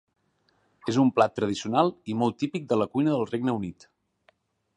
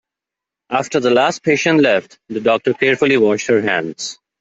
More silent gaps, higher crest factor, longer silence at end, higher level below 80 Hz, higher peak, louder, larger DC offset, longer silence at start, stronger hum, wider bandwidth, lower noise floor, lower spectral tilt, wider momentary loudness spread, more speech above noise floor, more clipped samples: neither; first, 22 dB vs 14 dB; first, 1.05 s vs 0.3 s; about the same, -64 dBFS vs -60 dBFS; second, -6 dBFS vs -2 dBFS; second, -26 LUFS vs -15 LUFS; neither; first, 0.85 s vs 0.7 s; neither; first, 10.5 kHz vs 8 kHz; second, -69 dBFS vs -85 dBFS; first, -6.5 dB/octave vs -4.5 dB/octave; about the same, 9 LU vs 10 LU; second, 44 dB vs 70 dB; neither